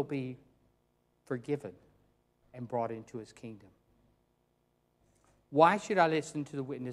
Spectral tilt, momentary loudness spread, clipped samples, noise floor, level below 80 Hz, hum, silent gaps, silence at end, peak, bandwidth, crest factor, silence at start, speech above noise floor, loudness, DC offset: -6 dB/octave; 23 LU; under 0.1%; -75 dBFS; -74 dBFS; 60 Hz at -70 dBFS; none; 0 s; -8 dBFS; 12 kHz; 26 dB; 0 s; 42 dB; -32 LUFS; under 0.1%